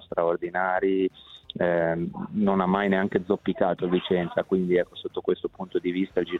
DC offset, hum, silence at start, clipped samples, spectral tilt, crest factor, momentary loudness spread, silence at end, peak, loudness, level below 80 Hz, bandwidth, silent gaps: under 0.1%; none; 0.1 s; under 0.1%; -8.5 dB/octave; 18 dB; 7 LU; 0 s; -8 dBFS; -26 LUFS; -58 dBFS; 4.2 kHz; none